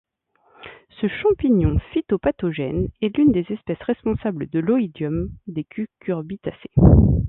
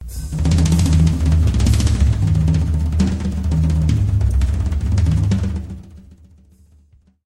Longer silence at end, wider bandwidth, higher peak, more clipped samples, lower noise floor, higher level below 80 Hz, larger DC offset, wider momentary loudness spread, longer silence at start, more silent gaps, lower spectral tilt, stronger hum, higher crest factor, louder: second, 0 s vs 1.3 s; second, 4 kHz vs 12.5 kHz; first, 0 dBFS vs -4 dBFS; neither; first, -62 dBFS vs -52 dBFS; second, -30 dBFS vs -20 dBFS; neither; first, 14 LU vs 7 LU; first, 0.6 s vs 0 s; neither; first, -13 dB/octave vs -7 dB/octave; neither; first, 20 dB vs 12 dB; second, -21 LUFS vs -17 LUFS